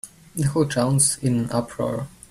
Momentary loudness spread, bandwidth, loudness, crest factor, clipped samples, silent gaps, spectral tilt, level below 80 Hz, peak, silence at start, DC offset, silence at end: 10 LU; 15 kHz; -22 LUFS; 18 dB; under 0.1%; none; -5 dB/octave; -50 dBFS; -6 dBFS; 0.05 s; under 0.1%; 0.2 s